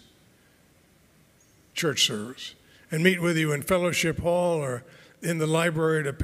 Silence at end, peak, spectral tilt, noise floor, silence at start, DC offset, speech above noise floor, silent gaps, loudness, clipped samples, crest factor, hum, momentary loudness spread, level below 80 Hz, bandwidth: 0 s; -4 dBFS; -4.5 dB/octave; -60 dBFS; 1.75 s; under 0.1%; 35 dB; none; -25 LUFS; under 0.1%; 24 dB; none; 13 LU; -56 dBFS; 16 kHz